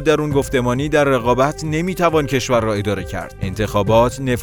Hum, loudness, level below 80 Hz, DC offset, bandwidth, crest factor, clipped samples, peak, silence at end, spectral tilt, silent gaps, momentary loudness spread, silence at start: none; -17 LUFS; -36 dBFS; under 0.1%; over 20 kHz; 16 dB; under 0.1%; 0 dBFS; 0 s; -6 dB/octave; none; 8 LU; 0 s